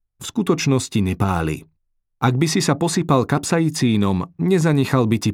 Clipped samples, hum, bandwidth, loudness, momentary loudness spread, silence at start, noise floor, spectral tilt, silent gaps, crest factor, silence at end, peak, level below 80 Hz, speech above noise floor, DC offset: under 0.1%; none; 16.5 kHz; -19 LUFS; 5 LU; 0.2 s; -69 dBFS; -5.5 dB/octave; none; 16 dB; 0 s; -2 dBFS; -46 dBFS; 51 dB; under 0.1%